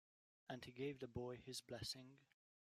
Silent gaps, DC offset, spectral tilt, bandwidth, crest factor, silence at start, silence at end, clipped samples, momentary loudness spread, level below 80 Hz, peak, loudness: none; under 0.1%; -4.5 dB/octave; 15.5 kHz; 18 dB; 0.5 s; 0.4 s; under 0.1%; 8 LU; -76 dBFS; -36 dBFS; -52 LUFS